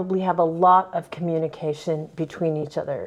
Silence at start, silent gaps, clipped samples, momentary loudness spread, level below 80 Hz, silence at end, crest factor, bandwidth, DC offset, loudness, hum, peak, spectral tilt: 0 s; none; under 0.1%; 11 LU; -64 dBFS; 0 s; 18 dB; 11 kHz; under 0.1%; -23 LUFS; none; -6 dBFS; -8 dB/octave